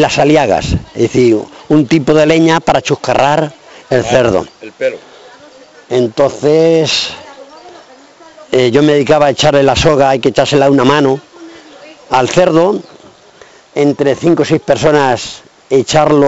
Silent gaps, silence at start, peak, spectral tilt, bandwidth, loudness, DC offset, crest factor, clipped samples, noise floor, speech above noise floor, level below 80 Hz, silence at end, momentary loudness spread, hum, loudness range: none; 0 s; 0 dBFS; -5.5 dB/octave; 8.2 kHz; -11 LUFS; under 0.1%; 12 dB; under 0.1%; -40 dBFS; 31 dB; -36 dBFS; 0 s; 10 LU; none; 5 LU